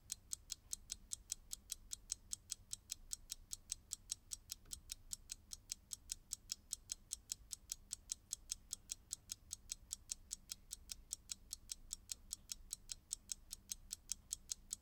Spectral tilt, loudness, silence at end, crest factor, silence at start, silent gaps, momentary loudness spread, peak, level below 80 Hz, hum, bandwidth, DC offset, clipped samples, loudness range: 1 dB/octave; -49 LUFS; 0 s; 32 dB; 0 s; none; 3 LU; -20 dBFS; -64 dBFS; none; 18 kHz; under 0.1%; under 0.1%; 1 LU